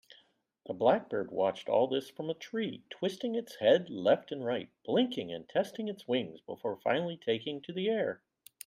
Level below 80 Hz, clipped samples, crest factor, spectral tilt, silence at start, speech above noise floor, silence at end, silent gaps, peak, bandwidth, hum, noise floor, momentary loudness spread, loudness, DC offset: -80 dBFS; under 0.1%; 20 dB; -5.5 dB/octave; 0.65 s; 36 dB; 0.5 s; none; -14 dBFS; 15.5 kHz; none; -68 dBFS; 11 LU; -33 LUFS; under 0.1%